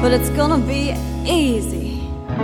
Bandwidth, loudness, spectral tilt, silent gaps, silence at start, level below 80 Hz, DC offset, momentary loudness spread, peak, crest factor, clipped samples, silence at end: 17 kHz; -19 LUFS; -5.5 dB/octave; none; 0 s; -26 dBFS; under 0.1%; 9 LU; -2 dBFS; 16 dB; under 0.1%; 0 s